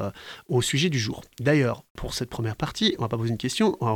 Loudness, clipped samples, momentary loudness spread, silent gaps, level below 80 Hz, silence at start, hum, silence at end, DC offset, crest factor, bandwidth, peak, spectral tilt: -26 LUFS; under 0.1%; 10 LU; 1.90-1.95 s; -48 dBFS; 0 s; none; 0 s; under 0.1%; 16 dB; 18.5 kHz; -8 dBFS; -5 dB/octave